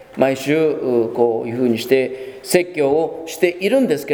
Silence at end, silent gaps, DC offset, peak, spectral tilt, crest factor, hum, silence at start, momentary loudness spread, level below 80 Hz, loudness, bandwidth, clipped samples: 0 s; none; under 0.1%; 0 dBFS; -5 dB/octave; 18 dB; none; 0 s; 3 LU; -60 dBFS; -18 LUFS; over 20 kHz; under 0.1%